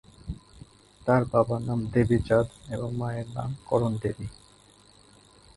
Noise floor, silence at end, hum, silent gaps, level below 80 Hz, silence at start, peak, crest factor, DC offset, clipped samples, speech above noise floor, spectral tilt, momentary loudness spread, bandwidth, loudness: -56 dBFS; 1.25 s; none; none; -48 dBFS; 0.25 s; -8 dBFS; 22 dB; under 0.1%; under 0.1%; 30 dB; -8 dB/octave; 18 LU; 11.5 kHz; -27 LUFS